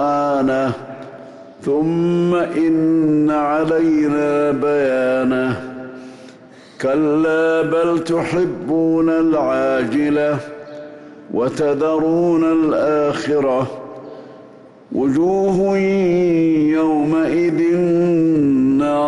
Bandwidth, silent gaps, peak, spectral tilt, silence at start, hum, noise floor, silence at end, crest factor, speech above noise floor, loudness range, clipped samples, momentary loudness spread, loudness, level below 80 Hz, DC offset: 11 kHz; none; -10 dBFS; -7.5 dB/octave; 0 s; none; -42 dBFS; 0 s; 8 dB; 26 dB; 3 LU; under 0.1%; 15 LU; -17 LUFS; -52 dBFS; under 0.1%